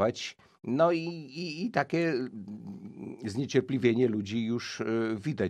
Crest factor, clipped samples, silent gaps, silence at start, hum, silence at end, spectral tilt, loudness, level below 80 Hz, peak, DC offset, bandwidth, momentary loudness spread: 20 dB; under 0.1%; none; 0 s; none; 0 s; -6 dB/octave; -30 LUFS; -72 dBFS; -10 dBFS; under 0.1%; 10 kHz; 16 LU